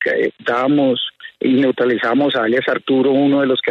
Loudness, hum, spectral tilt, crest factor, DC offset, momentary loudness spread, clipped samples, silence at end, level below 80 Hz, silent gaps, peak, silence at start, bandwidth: -16 LUFS; none; -7 dB/octave; 12 dB; under 0.1%; 4 LU; under 0.1%; 0 s; -64 dBFS; none; -4 dBFS; 0 s; 5.6 kHz